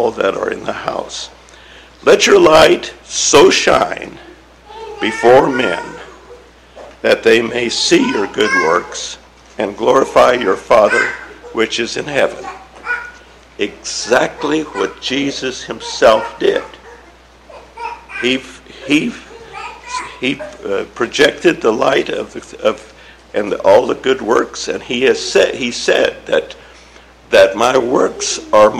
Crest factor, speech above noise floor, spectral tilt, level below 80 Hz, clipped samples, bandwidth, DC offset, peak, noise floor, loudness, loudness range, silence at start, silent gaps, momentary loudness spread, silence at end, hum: 14 dB; 29 dB; -3 dB/octave; -46 dBFS; under 0.1%; 15 kHz; under 0.1%; 0 dBFS; -42 dBFS; -14 LUFS; 7 LU; 0 s; none; 18 LU; 0 s; none